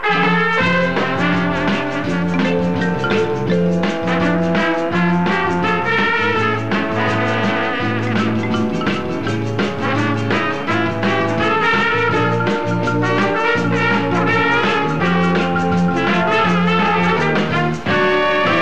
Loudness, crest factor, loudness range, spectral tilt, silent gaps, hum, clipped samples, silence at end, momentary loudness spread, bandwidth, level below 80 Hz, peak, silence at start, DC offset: -16 LUFS; 12 dB; 3 LU; -6.5 dB/octave; none; none; under 0.1%; 0 s; 4 LU; 8.6 kHz; -46 dBFS; -4 dBFS; 0 s; 2%